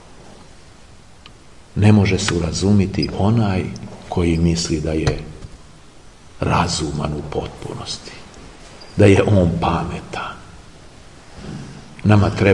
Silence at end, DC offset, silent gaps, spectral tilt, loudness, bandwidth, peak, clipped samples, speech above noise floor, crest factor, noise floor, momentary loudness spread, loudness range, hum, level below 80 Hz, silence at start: 0 s; 0.5%; none; -6 dB/octave; -18 LUFS; 11 kHz; 0 dBFS; under 0.1%; 28 dB; 20 dB; -45 dBFS; 23 LU; 6 LU; none; -38 dBFS; 0.1 s